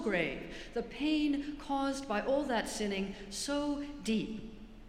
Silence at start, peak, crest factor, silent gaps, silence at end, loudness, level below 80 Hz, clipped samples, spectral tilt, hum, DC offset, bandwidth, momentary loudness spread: 0 s; -18 dBFS; 16 dB; none; 0 s; -35 LUFS; -54 dBFS; under 0.1%; -4 dB/octave; none; under 0.1%; 15 kHz; 9 LU